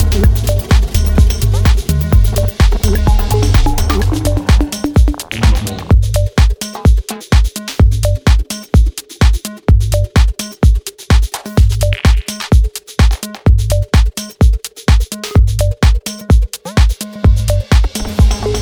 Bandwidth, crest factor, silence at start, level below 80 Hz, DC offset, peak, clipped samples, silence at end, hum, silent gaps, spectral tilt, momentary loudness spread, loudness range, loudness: over 20 kHz; 10 dB; 0 s; -12 dBFS; under 0.1%; 0 dBFS; under 0.1%; 0 s; none; none; -5.5 dB/octave; 3 LU; 1 LU; -14 LUFS